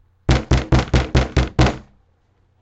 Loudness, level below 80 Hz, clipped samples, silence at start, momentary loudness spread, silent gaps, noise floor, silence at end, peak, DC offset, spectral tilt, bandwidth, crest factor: -18 LUFS; -24 dBFS; under 0.1%; 0.3 s; 3 LU; none; -60 dBFS; 0.8 s; 0 dBFS; under 0.1%; -6 dB/octave; 8.2 kHz; 18 dB